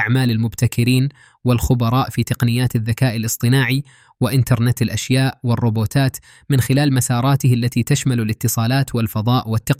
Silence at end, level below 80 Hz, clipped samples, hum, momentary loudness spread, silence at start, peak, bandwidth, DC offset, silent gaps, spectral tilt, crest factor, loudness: 0.05 s; -40 dBFS; under 0.1%; none; 4 LU; 0 s; -4 dBFS; 16 kHz; under 0.1%; none; -5.5 dB/octave; 14 dB; -18 LUFS